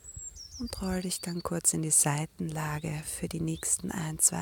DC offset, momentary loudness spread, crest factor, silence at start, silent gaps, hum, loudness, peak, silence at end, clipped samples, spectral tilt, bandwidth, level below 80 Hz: under 0.1%; 15 LU; 22 dB; 0.05 s; none; none; -29 LUFS; -10 dBFS; 0 s; under 0.1%; -3.5 dB/octave; 17 kHz; -52 dBFS